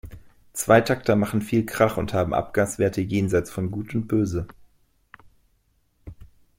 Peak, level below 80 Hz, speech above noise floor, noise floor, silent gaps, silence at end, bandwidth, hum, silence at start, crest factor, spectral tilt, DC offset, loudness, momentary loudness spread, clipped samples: -4 dBFS; -48 dBFS; 44 dB; -66 dBFS; none; 0.35 s; 16.5 kHz; none; 0.05 s; 22 dB; -6 dB/octave; under 0.1%; -23 LUFS; 11 LU; under 0.1%